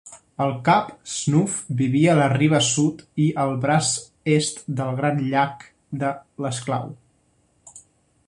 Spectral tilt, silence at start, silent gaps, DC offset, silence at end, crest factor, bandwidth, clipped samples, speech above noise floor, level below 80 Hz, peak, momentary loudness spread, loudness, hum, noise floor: -5 dB/octave; 0.05 s; none; under 0.1%; 0.5 s; 18 dB; 11.5 kHz; under 0.1%; 42 dB; -60 dBFS; -4 dBFS; 10 LU; -22 LUFS; none; -63 dBFS